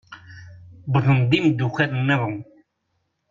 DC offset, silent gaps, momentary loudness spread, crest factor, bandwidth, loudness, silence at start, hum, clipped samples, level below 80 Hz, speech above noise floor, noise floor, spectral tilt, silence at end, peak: under 0.1%; none; 20 LU; 16 dB; 7.4 kHz; -20 LUFS; 0.1 s; none; under 0.1%; -56 dBFS; 53 dB; -73 dBFS; -7.5 dB/octave; 0.9 s; -6 dBFS